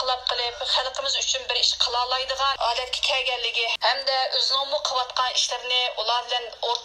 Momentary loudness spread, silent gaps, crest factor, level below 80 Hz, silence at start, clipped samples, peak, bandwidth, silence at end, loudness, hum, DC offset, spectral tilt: 4 LU; none; 20 dB; -56 dBFS; 0 s; under 0.1%; -6 dBFS; 15.5 kHz; 0 s; -23 LUFS; none; under 0.1%; 2 dB/octave